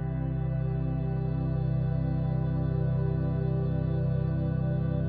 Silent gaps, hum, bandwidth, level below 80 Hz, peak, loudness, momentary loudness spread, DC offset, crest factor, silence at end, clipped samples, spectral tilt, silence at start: none; none; 4.6 kHz; -38 dBFS; -18 dBFS; -29 LUFS; 2 LU; 0.3%; 10 dB; 0 s; under 0.1%; -10.5 dB/octave; 0 s